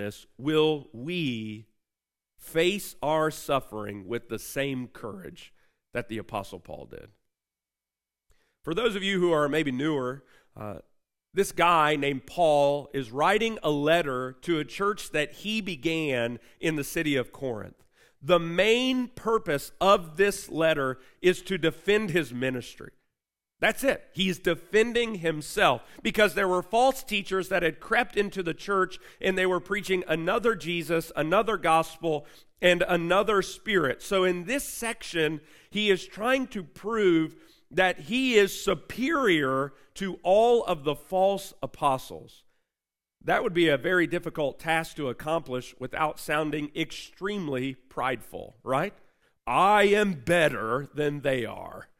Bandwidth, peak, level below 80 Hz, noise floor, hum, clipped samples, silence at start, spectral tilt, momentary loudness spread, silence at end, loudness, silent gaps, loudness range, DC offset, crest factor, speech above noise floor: 16 kHz; -6 dBFS; -54 dBFS; under -90 dBFS; none; under 0.1%; 0 s; -4.5 dB/octave; 13 LU; 0.15 s; -27 LUFS; none; 6 LU; under 0.1%; 20 dB; over 63 dB